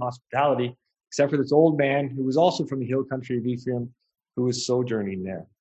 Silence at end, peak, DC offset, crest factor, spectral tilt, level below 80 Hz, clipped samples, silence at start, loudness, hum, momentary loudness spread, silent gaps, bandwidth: 0.15 s; -6 dBFS; under 0.1%; 20 dB; -6 dB/octave; -64 dBFS; under 0.1%; 0 s; -25 LUFS; none; 12 LU; none; 8.6 kHz